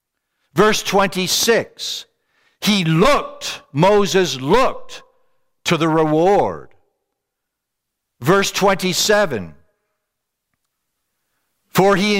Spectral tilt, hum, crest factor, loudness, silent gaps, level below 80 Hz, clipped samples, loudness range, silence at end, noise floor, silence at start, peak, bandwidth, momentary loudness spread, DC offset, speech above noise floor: -4 dB/octave; none; 18 dB; -17 LUFS; none; -44 dBFS; under 0.1%; 3 LU; 0 s; -79 dBFS; 0.55 s; 0 dBFS; 16.5 kHz; 11 LU; under 0.1%; 63 dB